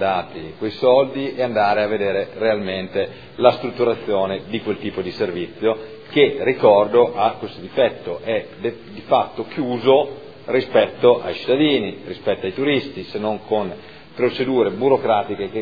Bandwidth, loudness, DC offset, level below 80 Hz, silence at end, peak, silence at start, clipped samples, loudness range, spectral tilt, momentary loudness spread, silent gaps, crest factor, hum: 5 kHz; -20 LUFS; 0.4%; -58 dBFS; 0 s; 0 dBFS; 0 s; under 0.1%; 3 LU; -8 dB/octave; 12 LU; none; 20 dB; none